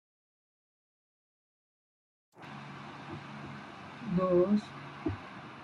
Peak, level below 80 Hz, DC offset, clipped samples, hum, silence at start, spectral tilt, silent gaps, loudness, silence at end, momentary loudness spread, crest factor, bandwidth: -16 dBFS; -66 dBFS; under 0.1%; under 0.1%; none; 2.35 s; -8 dB/octave; none; -33 LUFS; 0 s; 19 LU; 20 dB; 8.6 kHz